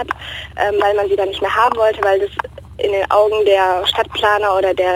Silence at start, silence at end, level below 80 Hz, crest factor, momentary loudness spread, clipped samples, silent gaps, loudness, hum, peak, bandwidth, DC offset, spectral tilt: 0 s; 0 s; -42 dBFS; 14 dB; 10 LU; under 0.1%; none; -15 LUFS; none; -2 dBFS; 17 kHz; under 0.1%; -4 dB/octave